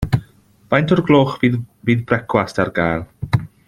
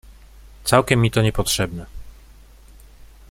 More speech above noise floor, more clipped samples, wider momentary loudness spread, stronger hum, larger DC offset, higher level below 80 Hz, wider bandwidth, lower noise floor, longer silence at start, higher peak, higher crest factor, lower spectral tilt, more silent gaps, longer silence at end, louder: about the same, 31 dB vs 28 dB; neither; second, 8 LU vs 16 LU; neither; neither; about the same, -40 dBFS vs -38 dBFS; second, 13 kHz vs 16.5 kHz; about the same, -48 dBFS vs -46 dBFS; about the same, 0 s vs 0.1 s; about the same, 0 dBFS vs -2 dBFS; about the same, 18 dB vs 22 dB; first, -7.5 dB/octave vs -4.5 dB/octave; neither; second, 0.2 s vs 1.2 s; about the same, -18 LUFS vs -19 LUFS